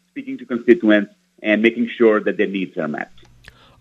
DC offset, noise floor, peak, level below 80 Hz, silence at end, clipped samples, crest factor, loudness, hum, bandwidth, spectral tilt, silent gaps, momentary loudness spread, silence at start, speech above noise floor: under 0.1%; -47 dBFS; 0 dBFS; -62 dBFS; 0.75 s; under 0.1%; 20 dB; -18 LUFS; none; 6.8 kHz; -7.5 dB/octave; none; 16 LU; 0.15 s; 30 dB